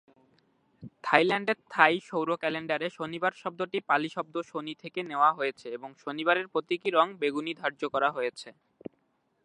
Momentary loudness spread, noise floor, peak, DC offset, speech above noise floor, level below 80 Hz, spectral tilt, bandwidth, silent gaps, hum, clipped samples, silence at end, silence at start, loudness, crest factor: 16 LU; -73 dBFS; -2 dBFS; under 0.1%; 44 dB; -78 dBFS; -5 dB/octave; 11 kHz; none; none; under 0.1%; 0.95 s; 0.8 s; -29 LUFS; 28 dB